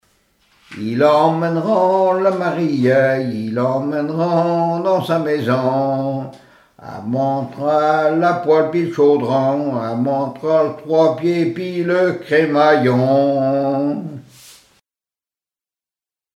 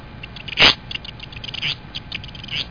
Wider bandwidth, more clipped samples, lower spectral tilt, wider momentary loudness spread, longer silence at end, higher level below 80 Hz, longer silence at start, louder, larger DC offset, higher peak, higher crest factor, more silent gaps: first, 13.5 kHz vs 5.4 kHz; neither; first, -7.5 dB/octave vs -3 dB/octave; second, 7 LU vs 20 LU; first, 2.15 s vs 0 s; second, -66 dBFS vs -42 dBFS; first, 0.7 s vs 0 s; about the same, -17 LUFS vs -19 LUFS; neither; about the same, -2 dBFS vs 0 dBFS; second, 16 dB vs 24 dB; neither